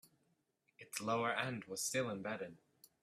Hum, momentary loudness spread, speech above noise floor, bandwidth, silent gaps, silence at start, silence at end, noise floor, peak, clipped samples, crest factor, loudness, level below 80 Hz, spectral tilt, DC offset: none; 11 LU; 40 dB; 15.5 kHz; none; 0.8 s; 0.45 s; -81 dBFS; -22 dBFS; under 0.1%; 20 dB; -40 LUFS; -84 dBFS; -3.5 dB/octave; under 0.1%